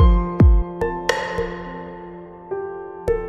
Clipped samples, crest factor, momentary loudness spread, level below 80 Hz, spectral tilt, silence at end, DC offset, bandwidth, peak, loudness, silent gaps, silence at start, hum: under 0.1%; 16 dB; 19 LU; -22 dBFS; -7 dB/octave; 0 s; under 0.1%; 8.6 kHz; -2 dBFS; -21 LUFS; none; 0 s; none